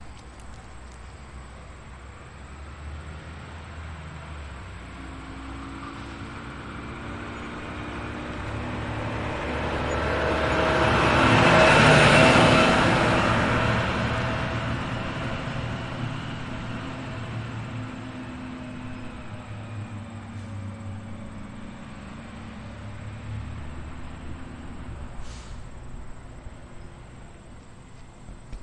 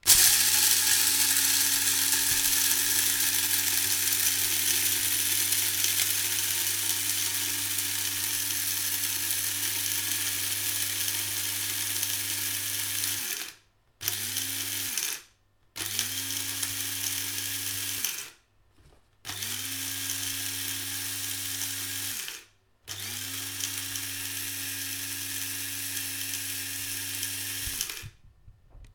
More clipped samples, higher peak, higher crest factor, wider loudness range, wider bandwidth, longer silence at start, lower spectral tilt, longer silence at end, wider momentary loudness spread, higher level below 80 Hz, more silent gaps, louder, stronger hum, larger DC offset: neither; about the same, -4 dBFS vs -2 dBFS; second, 22 dB vs 28 dB; first, 23 LU vs 10 LU; second, 11.5 kHz vs 17.5 kHz; about the same, 0 s vs 0.05 s; first, -5 dB/octave vs 0.5 dB/octave; about the same, 0 s vs 0.05 s; first, 26 LU vs 11 LU; first, -40 dBFS vs -60 dBFS; neither; first, -23 LUFS vs -26 LUFS; neither; neither